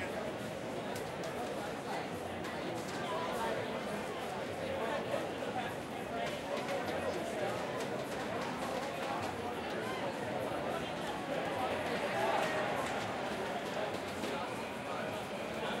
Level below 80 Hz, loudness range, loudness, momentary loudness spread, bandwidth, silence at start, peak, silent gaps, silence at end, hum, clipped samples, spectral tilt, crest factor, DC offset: -64 dBFS; 3 LU; -38 LUFS; 4 LU; 16 kHz; 0 s; -20 dBFS; none; 0 s; none; under 0.1%; -4.5 dB/octave; 18 dB; under 0.1%